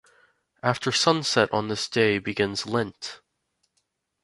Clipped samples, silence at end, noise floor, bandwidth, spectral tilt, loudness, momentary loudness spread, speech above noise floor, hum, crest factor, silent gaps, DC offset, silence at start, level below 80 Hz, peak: under 0.1%; 1.05 s; -75 dBFS; 11.5 kHz; -4 dB/octave; -24 LUFS; 9 LU; 51 dB; none; 24 dB; none; under 0.1%; 0.65 s; -60 dBFS; -4 dBFS